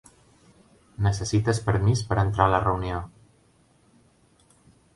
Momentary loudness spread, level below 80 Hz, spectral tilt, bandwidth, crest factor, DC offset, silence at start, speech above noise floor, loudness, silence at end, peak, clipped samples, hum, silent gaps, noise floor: 10 LU; -42 dBFS; -6 dB/octave; 11.5 kHz; 24 dB; under 0.1%; 1 s; 38 dB; -24 LUFS; 1.9 s; -4 dBFS; under 0.1%; none; none; -61 dBFS